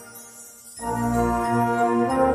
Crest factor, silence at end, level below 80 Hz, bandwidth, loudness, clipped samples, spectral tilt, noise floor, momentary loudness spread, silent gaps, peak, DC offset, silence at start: 16 dB; 0 s; -42 dBFS; 15.5 kHz; -23 LUFS; under 0.1%; -6.5 dB/octave; -44 dBFS; 19 LU; none; -6 dBFS; under 0.1%; 0 s